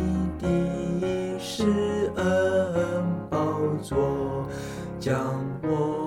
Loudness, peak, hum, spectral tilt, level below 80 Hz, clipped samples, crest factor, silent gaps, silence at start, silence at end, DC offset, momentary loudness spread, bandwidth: -27 LUFS; -12 dBFS; none; -7 dB/octave; -44 dBFS; under 0.1%; 14 dB; none; 0 s; 0 s; under 0.1%; 7 LU; 15.5 kHz